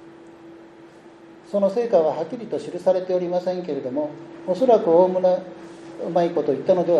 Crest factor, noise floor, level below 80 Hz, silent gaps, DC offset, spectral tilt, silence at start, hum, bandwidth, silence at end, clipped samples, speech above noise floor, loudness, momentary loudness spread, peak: 18 dB; -46 dBFS; -72 dBFS; none; under 0.1%; -7.5 dB/octave; 0 s; none; 9.2 kHz; 0 s; under 0.1%; 25 dB; -21 LUFS; 14 LU; -4 dBFS